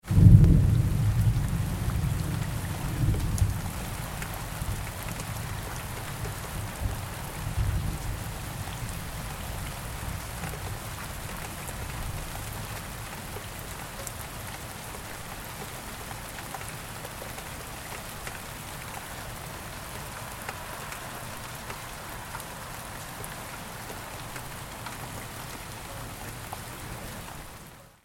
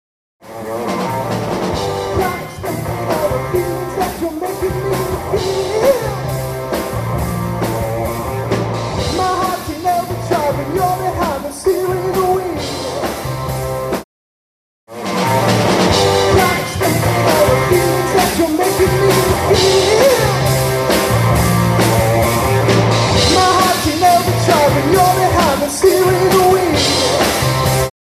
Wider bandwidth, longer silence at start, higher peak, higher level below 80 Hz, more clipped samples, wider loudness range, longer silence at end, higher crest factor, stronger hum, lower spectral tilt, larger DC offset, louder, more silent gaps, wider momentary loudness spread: about the same, 17 kHz vs 16 kHz; second, 0.05 s vs 0.45 s; about the same, -2 dBFS vs 0 dBFS; about the same, -36 dBFS vs -32 dBFS; neither; about the same, 8 LU vs 7 LU; about the same, 0.15 s vs 0.25 s; first, 28 dB vs 14 dB; neither; about the same, -5.5 dB/octave vs -4.5 dB/octave; neither; second, -32 LUFS vs -15 LUFS; second, none vs 14.04-14.87 s; about the same, 10 LU vs 9 LU